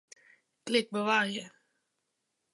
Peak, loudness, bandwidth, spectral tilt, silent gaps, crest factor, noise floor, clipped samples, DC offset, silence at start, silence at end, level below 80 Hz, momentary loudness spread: -12 dBFS; -30 LUFS; 11.5 kHz; -3.5 dB/octave; none; 22 dB; -82 dBFS; under 0.1%; under 0.1%; 0.65 s; 1.05 s; -86 dBFS; 19 LU